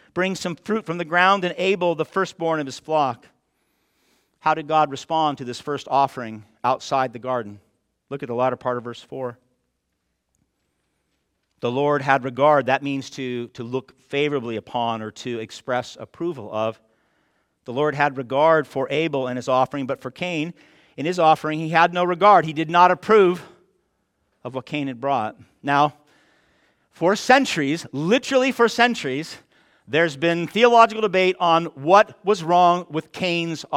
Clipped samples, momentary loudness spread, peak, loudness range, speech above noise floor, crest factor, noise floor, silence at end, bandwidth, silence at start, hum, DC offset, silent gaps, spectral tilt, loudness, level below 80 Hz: under 0.1%; 14 LU; -2 dBFS; 9 LU; 54 dB; 20 dB; -75 dBFS; 0 s; 15.5 kHz; 0.15 s; none; under 0.1%; none; -5 dB/octave; -21 LUFS; -68 dBFS